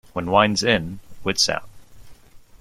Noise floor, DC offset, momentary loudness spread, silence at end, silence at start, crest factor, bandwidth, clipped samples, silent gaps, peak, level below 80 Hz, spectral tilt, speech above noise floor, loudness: -44 dBFS; under 0.1%; 12 LU; 0.05 s; 0.15 s; 22 dB; 15.5 kHz; under 0.1%; none; -2 dBFS; -50 dBFS; -3.5 dB/octave; 24 dB; -20 LUFS